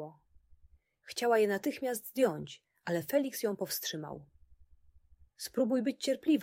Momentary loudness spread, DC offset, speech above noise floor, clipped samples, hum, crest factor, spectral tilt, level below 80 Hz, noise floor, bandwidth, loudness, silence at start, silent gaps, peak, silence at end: 16 LU; under 0.1%; 32 dB; under 0.1%; none; 18 dB; -4.5 dB/octave; -70 dBFS; -65 dBFS; 16.5 kHz; -33 LUFS; 0 s; none; -16 dBFS; 0 s